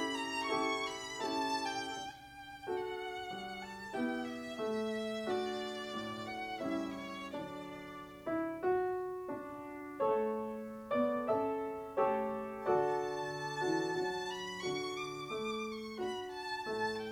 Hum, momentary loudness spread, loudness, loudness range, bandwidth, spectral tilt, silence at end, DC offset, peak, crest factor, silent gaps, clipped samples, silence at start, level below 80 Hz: none; 10 LU; -38 LUFS; 5 LU; 17 kHz; -4 dB/octave; 0 s; under 0.1%; -20 dBFS; 18 dB; none; under 0.1%; 0 s; -70 dBFS